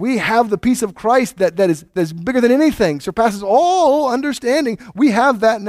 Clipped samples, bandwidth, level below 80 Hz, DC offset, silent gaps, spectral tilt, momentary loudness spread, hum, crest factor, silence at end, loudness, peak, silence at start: under 0.1%; 16 kHz; -48 dBFS; under 0.1%; none; -5 dB/octave; 5 LU; none; 14 dB; 0 s; -16 LUFS; 0 dBFS; 0 s